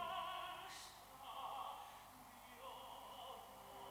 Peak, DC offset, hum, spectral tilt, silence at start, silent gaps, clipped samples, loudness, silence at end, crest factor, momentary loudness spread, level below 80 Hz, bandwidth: -34 dBFS; under 0.1%; 50 Hz at -75 dBFS; -2 dB/octave; 0 s; none; under 0.1%; -52 LUFS; 0 s; 18 dB; 11 LU; -76 dBFS; over 20 kHz